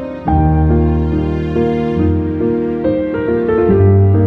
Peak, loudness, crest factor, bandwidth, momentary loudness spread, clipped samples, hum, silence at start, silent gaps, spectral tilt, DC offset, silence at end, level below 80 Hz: -2 dBFS; -14 LUFS; 10 dB; 4.5 kHz; 6 LU; under 0.1%; none; 0 s; none; -11 dB/octave; under 0.1%; 0 s; -24 dBFS